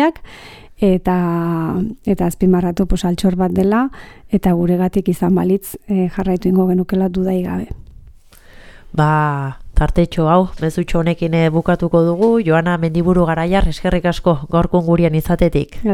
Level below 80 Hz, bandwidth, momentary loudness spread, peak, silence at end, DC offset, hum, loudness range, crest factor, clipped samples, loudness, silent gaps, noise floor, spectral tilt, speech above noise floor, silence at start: -28 dBFS; 15.5 kHz; 6 LU; 0 dBFS; 0 s; under 0.1%; none; 4 LU; 16 dB; under 0.1%; -16 LUFS; none; -42 dBFS; -7.5 dB/octave; 27 dB; 0 s